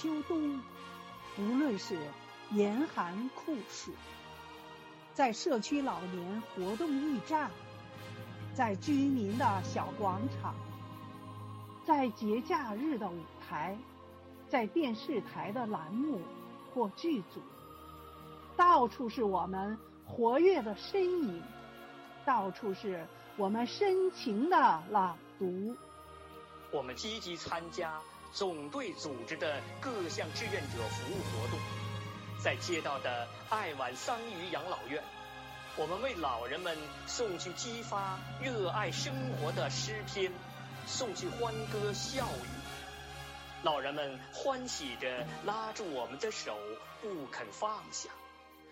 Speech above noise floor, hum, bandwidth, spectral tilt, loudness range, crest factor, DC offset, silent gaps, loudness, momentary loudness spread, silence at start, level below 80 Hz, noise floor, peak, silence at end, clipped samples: 21 dB; none; 16 kHz; -5 dB/octave; 6 LU; 20 dB; under 0.1%; none; -36 LUFS; 16 LU; 0 s; -64 dBFS; -56 dBFS; -16 dBFS; 0 s; under 0.1%